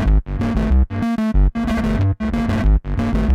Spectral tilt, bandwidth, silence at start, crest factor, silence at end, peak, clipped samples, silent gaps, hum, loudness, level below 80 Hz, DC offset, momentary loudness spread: -8.5 dB/octave; 7.6 kHz; 0 s; 10 dB; 0 s; -6 dBFS; under 0.1%; none; none; -19 LUFS; -18 dBFS; under 0.1%; 3 LU